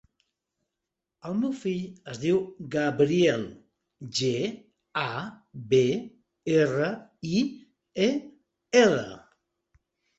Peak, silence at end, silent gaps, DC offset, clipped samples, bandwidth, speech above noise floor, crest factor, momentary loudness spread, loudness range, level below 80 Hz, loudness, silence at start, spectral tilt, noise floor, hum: -6 dBFS; 1 s; none; under 0.1%; under 0.1%; 8.2 kHz; 60 dB; 22 dB; 18 LU; 2 LU; -66 dBFS; -27 LUFS; 1.25 s; -5.5 dB/octave; -86 dBFS; none